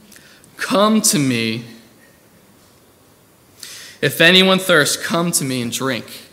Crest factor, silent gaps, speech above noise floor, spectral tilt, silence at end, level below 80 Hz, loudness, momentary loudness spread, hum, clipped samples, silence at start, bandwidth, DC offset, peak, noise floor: 18 dB; none; 35 dB; -3 dB/octave; 0.1 s; -64 dBFS; -15 LUFS; 19 LU; none; under 0.1%; 0.6 s; 16.5 kHz; under 0.1%; 0 dBFS; -51 dBFS